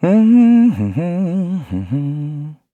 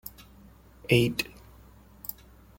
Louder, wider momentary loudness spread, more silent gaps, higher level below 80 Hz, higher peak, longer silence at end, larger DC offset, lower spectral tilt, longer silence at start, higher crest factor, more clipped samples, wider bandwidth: first, -15 LUFS vs -28 LUFS; second, 14 LU vs 20 LU; neither; about the same, -52 dBFS vs -54 dBFS; first, -2 dBFS vs -6 dBFS; second, 0.2 s vs 0.45 s; neither; first, -10 dB/octave vs -5.5 dB/octave; about the same, 0 s vs 0.05 s; second, 12 dB vs 24 dB; neither; second, 4 kHz vs 17 kHz